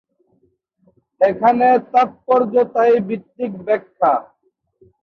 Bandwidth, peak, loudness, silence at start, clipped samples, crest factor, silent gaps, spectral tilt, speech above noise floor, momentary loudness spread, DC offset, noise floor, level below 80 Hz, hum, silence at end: 6.2 kHz; -2 dBFS; -17 LUFS; 1.2 s; under 0.1%; 16 dB; none; -8 dB/octave; 46 dB; 10 LU; under 0.1%; -62 dBFS; -64 dBFS; none; 0.8 s